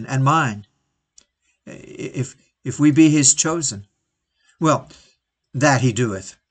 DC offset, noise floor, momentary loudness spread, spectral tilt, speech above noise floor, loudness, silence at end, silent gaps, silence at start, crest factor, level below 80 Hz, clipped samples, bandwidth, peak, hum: under 0.1%; -74 dBFS; 20 LU; -4.5 dB/octave; 56 dB; -17 LUFS; 0.2 s; none; 0 s; 20 dB; -58 dBFS; under 0.1%; 9.4 kHz; 0 dBFS; none